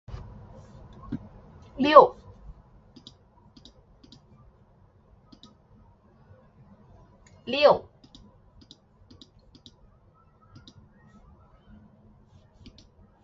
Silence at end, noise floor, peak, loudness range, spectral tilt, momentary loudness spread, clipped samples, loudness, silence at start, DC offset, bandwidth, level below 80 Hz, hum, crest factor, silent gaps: 5.45 s; -59 dBFS; 0 dBFS; 5 LU; -2.5 dB/octave; 33 LU; under 0.1%; -21 LUFS; 0.1 s; under 0.1%; 7.2 kHz; -56 dBFS; none; 30 dB; none